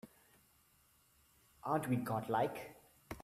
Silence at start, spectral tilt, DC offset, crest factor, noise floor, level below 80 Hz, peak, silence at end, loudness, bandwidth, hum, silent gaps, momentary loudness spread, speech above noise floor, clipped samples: 0.05 s; -6.5 dB/octave; under 0.1%; 20 dB; -71 dBFS; -70 dBFS; -22 dBFS; 0 s; -39 LUFS; 15.5 kHz; none; none; 18 LU; 34 dB; under 0.1%